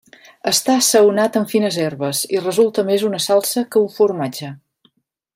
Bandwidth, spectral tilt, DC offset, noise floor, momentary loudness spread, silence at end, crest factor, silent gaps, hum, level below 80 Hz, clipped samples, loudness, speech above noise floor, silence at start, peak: 16 kHz; -3.5 dB/octave; under 0.1%; -60 dBFS; 10 LU; 0.8 s; 16 dB; none; none; -66 dBFS; under 0.1%; -17 LUFS; 44 dB; 0.45 s; 0 dBFS